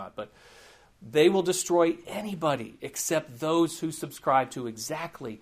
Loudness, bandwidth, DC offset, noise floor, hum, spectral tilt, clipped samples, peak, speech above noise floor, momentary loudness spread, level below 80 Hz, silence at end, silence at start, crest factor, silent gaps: -27 LUFS; 15.5 kHz; under 0.1%; -55 dBFS; none; -4 dB/octave; under 0.1%; -8 dBFS; 28 dB; 13 LU; -66 dBFS; 0.05 s; 0 s; 20 dB; none